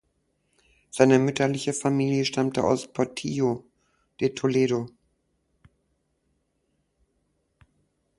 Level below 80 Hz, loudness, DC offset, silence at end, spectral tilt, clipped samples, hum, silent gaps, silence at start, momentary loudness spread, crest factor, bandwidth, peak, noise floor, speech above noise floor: -62 dBFS; -25 LUFS; under 0.1%; 3.3 s; -5.5 dB/octave; under 0.1%; none; none; 0.95 s; 9 LU; 24 dB; 11.5 kHz; -4 dBFS; -73 dBFS; 50 dB